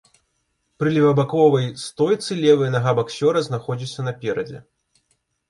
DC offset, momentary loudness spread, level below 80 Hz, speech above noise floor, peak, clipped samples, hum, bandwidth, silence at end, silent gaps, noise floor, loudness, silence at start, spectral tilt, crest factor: under 0.1%; 11 LU; -62 dBFS; 52 dB; -4 dBFS; under 0.1%; none; 11.5 kHz; 0.9 s; none; -71 dBFS; -20 LUFS; 0.8 s; -6.5 dB/octave; 16 dB